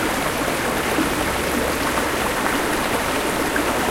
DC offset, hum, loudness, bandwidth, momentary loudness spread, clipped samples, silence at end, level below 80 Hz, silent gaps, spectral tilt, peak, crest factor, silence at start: under 0.1%; none; -21 LUFS; 16 kHz; 1 LU; under 0.1%; 0 s; -38 dBFS; none; -3.5 dB/octave; -4 dBFS; 16 dB; 0 s